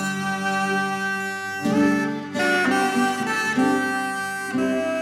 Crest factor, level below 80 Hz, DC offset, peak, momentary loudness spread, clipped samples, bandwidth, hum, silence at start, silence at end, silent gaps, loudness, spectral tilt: 14 dB; -66 dBFS; under 0.1%; -8 dBFS; 6 LU; under 0.1%; 16 kHz; none; 0 s; 0 s; none; -22 LUFS; -4.5 dB/octave